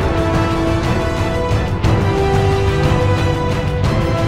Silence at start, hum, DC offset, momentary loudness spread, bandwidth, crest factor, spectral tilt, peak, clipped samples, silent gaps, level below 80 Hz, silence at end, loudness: 0 s; none; under 0.1%; 3 LU; 13.5 kHz; 12 dB; -7 dB/octave; -2 dBFS; under 0.1%; none; -24 dBFS; 0 s; -16 LUFS